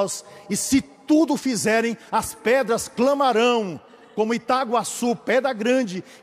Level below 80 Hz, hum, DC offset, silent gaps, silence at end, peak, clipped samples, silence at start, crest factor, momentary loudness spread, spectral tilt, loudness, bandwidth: -58 dBFS; none; under 0.1%; none; 0.05 s; -8 dBFS; under 0.1%; 0 s; 14 dB; 8 LU; -3.5 dB/octave; -22 LUFS; 15.5 kHz